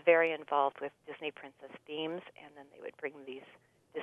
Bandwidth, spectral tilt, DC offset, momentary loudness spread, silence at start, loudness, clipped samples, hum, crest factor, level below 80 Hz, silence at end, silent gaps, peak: 3.8 kHz; -6 dB/octave; under 0.1%; 22 LU; 0.05 s; -35 LUFS; under 0.1%; none; 24 dB; -88 dBFS; 0 s; none; -12 dBFS